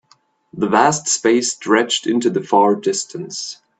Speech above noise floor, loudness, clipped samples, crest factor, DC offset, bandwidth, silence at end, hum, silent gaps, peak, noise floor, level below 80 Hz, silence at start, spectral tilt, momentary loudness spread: 40 dB; -17 LUFS; under 0.1%; 18 dB; under 0.1%; 9.4 kHz; 0.25 s; none; none; 0 dBFS; -57 dBFS; -64 dBFS; 0.55 s; -3 dB/octave; 12 LU